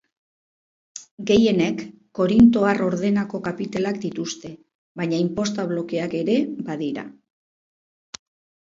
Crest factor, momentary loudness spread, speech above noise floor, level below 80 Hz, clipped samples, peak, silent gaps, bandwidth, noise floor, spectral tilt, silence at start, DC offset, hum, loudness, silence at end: 20 dB; 24 LU; over 69 dB; -52 dBFS; under 0.1%; -4 dBFS; 1.11-1.18 s, 4.75-4.95 s; 7.6 kHz; under -90 dBFS; -6 dB/octave; 0.95 s; under 0.1%; none; -22 LUFS; 1.55 s